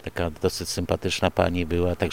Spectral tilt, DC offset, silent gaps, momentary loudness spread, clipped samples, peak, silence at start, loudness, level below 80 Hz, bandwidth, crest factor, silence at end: -5 dB/octave; under 0.1%; none; 5 LU; under 0.1%; -4 dBFS; 0 s; -25 LUFS; -46 dBFS; 17 kHz; 22 dB; 0 s